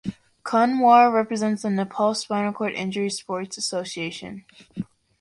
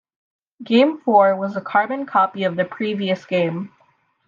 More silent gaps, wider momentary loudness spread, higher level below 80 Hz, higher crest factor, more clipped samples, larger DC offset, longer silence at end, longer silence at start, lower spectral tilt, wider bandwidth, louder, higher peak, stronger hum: neither; first, 21 LU vs 9 LU; first, -64 dBFS vs -74 dBFS; about the same, 18 dB vs 18 dB; neither; neither; second, 0.4 s vs 0.6 s; second, 0.05 s vs 0.6 s; second, -4.5 dB/octave vs -7.5 dB/octave; first, 11.5 kHz vs 7.2 kHz; second, -22 LUFS vs -19 LUFS; about the same, -4 dBFS vs -2 dBFS; neither